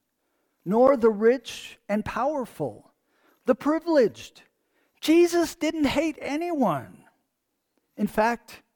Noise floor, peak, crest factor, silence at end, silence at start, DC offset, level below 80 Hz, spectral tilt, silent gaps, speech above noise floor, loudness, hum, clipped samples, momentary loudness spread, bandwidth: -78 dBFS; -8 dBFS; 18 dB; 0.2 s; 0.65 s; under 0.1%; -56 dBFS; -5.5 dB/octave; none; 54 dB; -24 LUFS; none; under 0.1%; 14 LU; 19 kHz